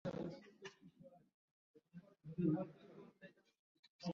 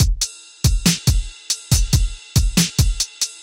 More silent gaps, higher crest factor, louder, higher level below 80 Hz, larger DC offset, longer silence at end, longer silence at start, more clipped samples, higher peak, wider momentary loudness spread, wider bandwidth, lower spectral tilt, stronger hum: first, 1.34-1.74 s, 3.59-3.83 s, 3.89-3.99 s vs none; first, 22 dB vs 16 dB; second, -45 LUFS vs -19 LUFS; second, -82 dBFS vs -22 dBFS; neither; about the same, 0 s vs 0 s; about the same, 0.05 s vs 0 s; neither; second, -26 dBFS vs -4 dBFS; first, 24 LU vs 7 LU; second, 7.4 kHz vs 17 kHz; first, -7.5 dB/octave vs -3.5 dB/octave; neither